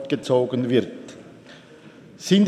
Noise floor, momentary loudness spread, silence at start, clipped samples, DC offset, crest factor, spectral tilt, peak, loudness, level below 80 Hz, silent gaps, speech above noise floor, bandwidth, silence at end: -46 dBFS; 24 LU; 0 s; under 0.1%; under 0.1%; 18 dB; -6 dB/octave; -4 dBFS; -22 LUFS; -70 dBFS; none; 26 dB; 13 kHz; 0 s